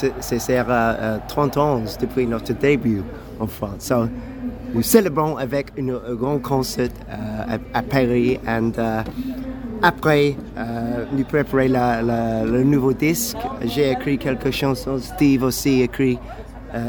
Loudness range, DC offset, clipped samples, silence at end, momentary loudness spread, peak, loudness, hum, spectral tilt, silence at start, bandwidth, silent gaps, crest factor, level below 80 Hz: 3 LU; under 0.1%; under 0.1%; 0 s; 11 LU; 0 dBFS; -21 LUFS; none; -5.5 dB/octave; 0 s; over 20 kHz; none; 20 dB; -38 dBFS